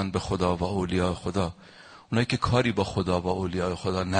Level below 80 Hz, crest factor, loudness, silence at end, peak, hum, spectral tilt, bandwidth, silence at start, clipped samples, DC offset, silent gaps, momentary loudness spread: -46 dBFS; 18 dB; -27 LUFS; 0 s; -8 dBFS; none; -6 dB/octave; 9.8 kHz; 0 s; under 0.1%; under 0.1%; none; 6 LU